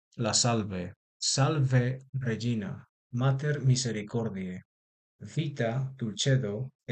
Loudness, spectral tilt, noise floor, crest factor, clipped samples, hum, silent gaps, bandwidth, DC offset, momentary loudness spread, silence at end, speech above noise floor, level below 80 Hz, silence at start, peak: -29 LUFS; -4.5 dB/octave; under -90 dBFS; 18 dB; under 0.1%; none; 0.96-1.20 s, 2.09-2.13 s, 2.89-3.10 s, 4.65-5.19 s, 6.75-6.79 s; 9.2 kHz; under 0.1%; 13 LU; 0 s; over 61 dB; -62 dBFS; 0.15 s; -12 dBFS